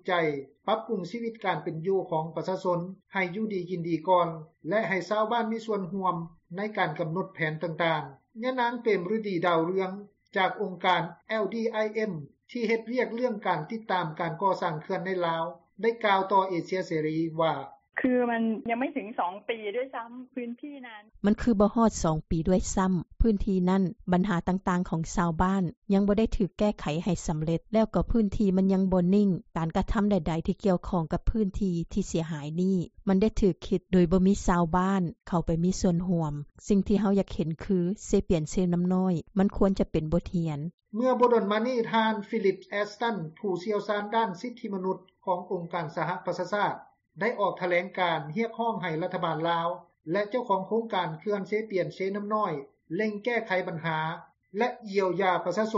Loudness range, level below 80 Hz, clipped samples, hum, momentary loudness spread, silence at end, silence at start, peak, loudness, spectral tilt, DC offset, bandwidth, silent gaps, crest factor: 4 LU; -44 dBFS; under 0.1%; none; 8 LU; 0 s; 0.05 s; -10 dBFS; -28 LUFS; -6 dB/octave; under 0.1%; 8 kHz; 25.77-25.82 s, 40.74-40.78 s; 18 dB